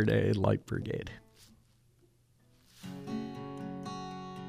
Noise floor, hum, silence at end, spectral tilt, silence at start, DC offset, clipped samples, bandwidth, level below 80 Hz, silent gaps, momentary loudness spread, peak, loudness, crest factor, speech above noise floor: -67 dBFS; none; 0 s; -7.5 dB/octave; 0 s; under 0.1%; under 0.1%; 14 kHz; -58 dBFS; none; 19 LU; -14 dBFS; -35 LUFS; 22 dB; 36 dB